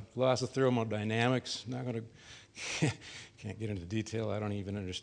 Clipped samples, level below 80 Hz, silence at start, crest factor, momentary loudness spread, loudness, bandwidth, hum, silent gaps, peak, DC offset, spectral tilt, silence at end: under 0.1%; -64 dBFS; 0 s; 20 dB; 15 LU; -34 LUFS; 10.5 kHz; none; none; -14 dBFS; under 0.1%; -5.5 dB/octave; 0 s